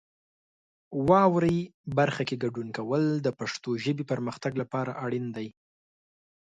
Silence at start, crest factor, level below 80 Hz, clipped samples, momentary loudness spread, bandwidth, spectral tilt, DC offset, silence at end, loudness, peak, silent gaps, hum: 0.9 s; 22 dB; -62 dBFS; under 0.1%; 12 LU; 9.4 kHz; -7 dB/octave; under 0.1%; 1 s; -28 LUFS; -6 dBFS; 1.74-1.84 s; none